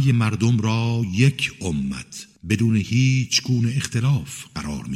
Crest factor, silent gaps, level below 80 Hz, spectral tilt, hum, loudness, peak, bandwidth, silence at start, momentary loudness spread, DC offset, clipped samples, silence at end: 18 dB; none; -46 dBFS; -5 dB/octave; none; -21 LUFS; -2 dBFS; 13.5 kHz; 0 s; 12 LU; under 0.1%; under 0.1%; 0 s